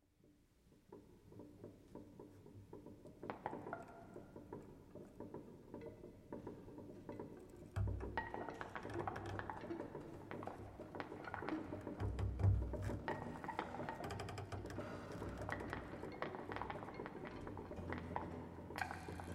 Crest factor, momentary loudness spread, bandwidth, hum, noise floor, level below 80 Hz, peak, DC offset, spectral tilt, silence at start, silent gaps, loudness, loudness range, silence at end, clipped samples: 26 dB; 14 LU; 13 kHz; none; -72 dBFS; -56 dBFS; -22 dBFS; under 0.1%; -7 dB/octave; 0.25 s; none; -48 LUFS; 11 LU; 0 s; under 0.1%